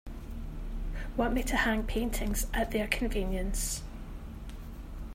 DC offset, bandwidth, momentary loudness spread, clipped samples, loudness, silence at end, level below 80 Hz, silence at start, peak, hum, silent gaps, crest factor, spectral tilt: under 0.1%; 16 kHz; 16 LU; under 0.1%; -33 LUFS; 0 s; -36 dBFS; 0.05 s; -12 dBFS; none; none; 20 dB; -4 dB/octave